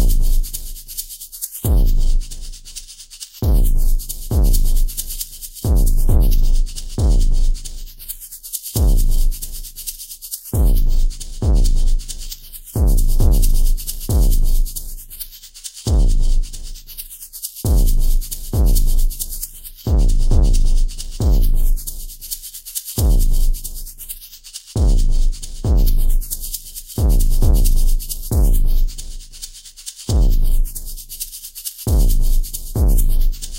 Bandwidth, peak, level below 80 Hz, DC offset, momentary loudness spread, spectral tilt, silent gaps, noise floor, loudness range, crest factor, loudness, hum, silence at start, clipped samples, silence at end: 16 kHz; -2 dBFS; -16 dBFS; under 0.1%; 13 LU; -5 dB/octave; none; -37 dBFS; 3 LU; 12 dB; -21 LUFS; none; 0 s; under 0.1%; 0 s